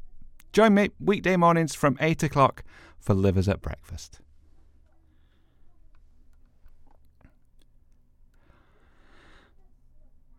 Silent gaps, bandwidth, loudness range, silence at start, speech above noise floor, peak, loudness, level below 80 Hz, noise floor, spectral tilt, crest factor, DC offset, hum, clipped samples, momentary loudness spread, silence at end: none; 15.5 kHz; 12 LU; 0 s; 35 dB; -6 dBFS; -23 LUFS; -48 dBFS; -59 dBFS; -6.5 dB/octave; 22 dB; under 0.1%; none; under 0.1%; 20 LU; 3.7 s